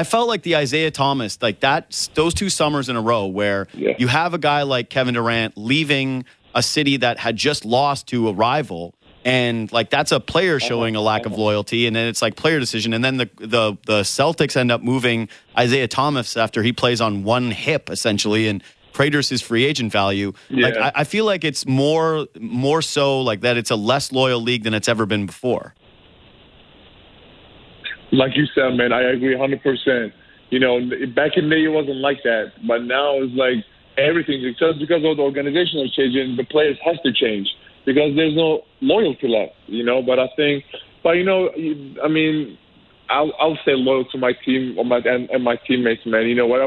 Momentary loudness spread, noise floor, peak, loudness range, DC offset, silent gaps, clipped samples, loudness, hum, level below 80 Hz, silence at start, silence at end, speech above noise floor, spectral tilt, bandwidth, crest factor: 6 LU; -49 dBFS; -4 dBFS; 2 LU; under 0.1%; none; under 0.1%; -19 LUFS; none; -54 dBFS; 0 s; 0 s; 30 dB; -4.5 dB/octave; 11 kHz; 16 dB